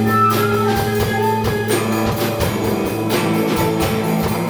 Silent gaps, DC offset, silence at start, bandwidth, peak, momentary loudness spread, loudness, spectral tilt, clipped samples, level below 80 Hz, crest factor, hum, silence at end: none; under 0.1%; 0 s; over 20 kHz; -4 dBFS; 4 LU; -17 LUFS; -5.5 dB/octave; under 0.1%; -38 dBFS; 12 dB; none; 0 s